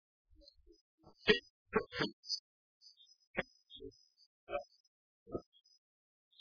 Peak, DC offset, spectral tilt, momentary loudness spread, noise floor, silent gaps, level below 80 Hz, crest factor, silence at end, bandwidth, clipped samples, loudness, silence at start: -14 dBFS; under 0.1%; -1.5 dB/octave; 25 LU; -64 dBFS; 1.50-1.65 s, 2.13-2.23 s, 2.39-2.80 s, 3.27-3.34 s, 4.26-4.47 s, 4.80-5.26 s; -66 dBFS; 30 dB; 1 s; 5.4 kHz; under 0.1%; -39 LUFS; 1.25 s